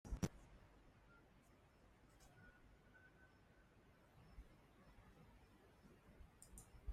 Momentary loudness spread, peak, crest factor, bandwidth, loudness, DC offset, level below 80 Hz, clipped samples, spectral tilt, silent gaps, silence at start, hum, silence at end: 18 LU; -30 dBFS; 28 dB; 15 kHz; -60 LUFS; under 0.1%; -64 dBFS; under 0.1%; -5.5 dB/octave; none; 0.05 s; none; 0 s